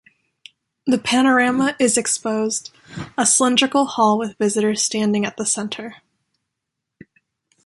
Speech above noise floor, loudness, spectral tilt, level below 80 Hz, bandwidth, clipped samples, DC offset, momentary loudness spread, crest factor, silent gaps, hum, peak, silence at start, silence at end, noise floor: 62 dB; -18 LUFS; -2.5 dB/octave; -62 dBFS; 11.5 kHz; under 0.1%; under 0.1%; 14 LU; 18 dB; none; none; -2 dBFS; 0.85 s; 1.7 s; -81 dBFS